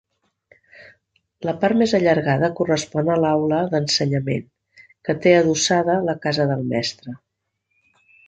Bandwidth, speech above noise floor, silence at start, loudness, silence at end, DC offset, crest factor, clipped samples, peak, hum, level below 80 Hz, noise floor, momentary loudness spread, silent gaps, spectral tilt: 9.4 kHz; 56 dB; 1.4 s; -20 LUFS; 1.1 s; under 0.1%; 18 dB; under 0.1%; -2 dBFS; none; -58 dBFS; -75 dBFS; 12 LU; none; -5 dB/octave